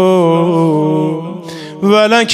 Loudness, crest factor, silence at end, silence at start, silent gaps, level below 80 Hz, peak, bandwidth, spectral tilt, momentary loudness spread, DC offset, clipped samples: -12 LUFS; 10 dB; 0 s; 0 s; none; -64 dBFS; 0 dBFS; 13 kHz; -5.5 dB/octave; 16 LU; under 0.1%; under 0.1%